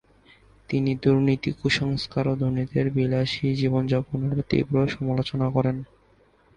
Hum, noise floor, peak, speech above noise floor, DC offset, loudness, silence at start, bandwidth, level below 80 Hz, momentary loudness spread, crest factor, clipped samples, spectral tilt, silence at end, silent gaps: none; -59 dBFS; -6 dBFS; 36 dB; under 0.1%; -24 LUFS; 0.7 s; 9.4 kHz; -50 dBFS; 5 LU; 18 dB; under 0.1%; -7.5 dB/octave; 0.7 s; none